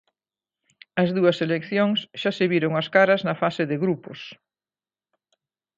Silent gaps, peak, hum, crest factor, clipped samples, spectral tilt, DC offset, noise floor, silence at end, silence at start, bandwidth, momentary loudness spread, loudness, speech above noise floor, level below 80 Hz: none; -4 dBFS; none; 20 dB; under 0.1%; -7 dB/octave; under 0.1%; under -90 dBFS; 1.45 s; 0.95 s; 7.6 kHz; 12 LU; -22 LUFS; over 68 dB; -72 dBFS